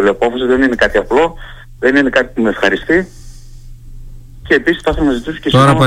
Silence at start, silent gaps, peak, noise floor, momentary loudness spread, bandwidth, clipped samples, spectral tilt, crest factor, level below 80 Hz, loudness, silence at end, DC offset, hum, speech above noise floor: 0 s; none; 0 dBFS; -32 dBFS; 6 LU; 14.5 kHz; under 0.1%; -6 dB/octave; 14 dB; -30 dBFS; -13 LUFS; 0 s; under 0.1%; none; 20 dB